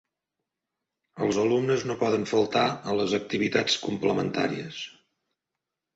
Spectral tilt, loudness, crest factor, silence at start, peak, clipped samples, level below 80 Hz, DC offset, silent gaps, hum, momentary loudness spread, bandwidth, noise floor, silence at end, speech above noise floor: -4.5 dB/octave; -26 LUFS; 20 dB; 1.15 s; -8 dBFS; under 0.1%; -64 dBFS; under 0.1%; none; none; 7 LU; 8 kHz; -86 dBFS; 1.05 s; 61 dB